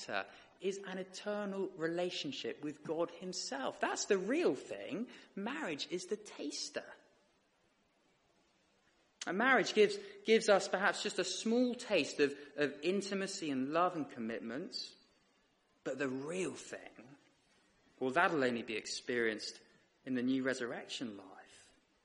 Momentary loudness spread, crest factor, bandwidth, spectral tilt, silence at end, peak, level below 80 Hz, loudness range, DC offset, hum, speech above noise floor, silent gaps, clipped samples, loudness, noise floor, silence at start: 13 LU; 22 dB; 11.5 kHz; -3.5 dB/octave; 0.45 s; -16 dBFS; -82 dBFS; 11 LU; under 0.1%; none; 38 dB; none; under 0.1%; -37 LUFS; -75 dBFS; 0 s